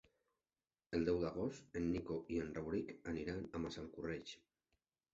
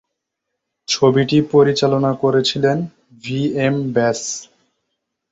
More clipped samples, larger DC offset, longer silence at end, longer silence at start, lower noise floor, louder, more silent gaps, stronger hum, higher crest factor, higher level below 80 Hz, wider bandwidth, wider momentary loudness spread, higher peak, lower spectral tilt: neither; neither; second, 0.75 s vs 0.9 s; about the same, 0.9 s vs 0.9 s; first, under -90 dBFS vs -78 dBFS; second, -43 LUFS vs -17 LUFS; neither; neither; about the same, 20 dB vs 16 dB; about the same, -62 dBFS vs -58 dBFS; about the same, 7.8 kHz vs 8 kHz; second, 8 LU vs 13 LU; second, -24 dBFS vs -2 dBFS; about the same, -6 dB/octave vs -5 dB/octave